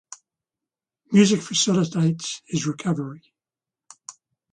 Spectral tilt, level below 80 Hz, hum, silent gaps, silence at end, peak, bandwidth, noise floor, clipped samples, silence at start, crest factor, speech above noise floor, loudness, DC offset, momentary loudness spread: -4.5 dB/octave; -64 dBFS; none; none; 0.4 s; -4 dBFS; 10 kHz; under -90 dBFS; under 0.1%; 1.1 s; 20 dB; over 69 dB; -22 LUFS; under 0.1%; 24 LU